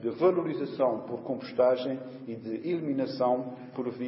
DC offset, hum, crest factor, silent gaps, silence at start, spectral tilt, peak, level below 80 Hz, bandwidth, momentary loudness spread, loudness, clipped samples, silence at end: under 0.1%; none; 18 dB; none; 0 s; -10.5 dB/octave; -12 dBFS; -78 dBFS; 5.8 kHz; 11 LU; -30 LUFS; under 0.1%; 0 s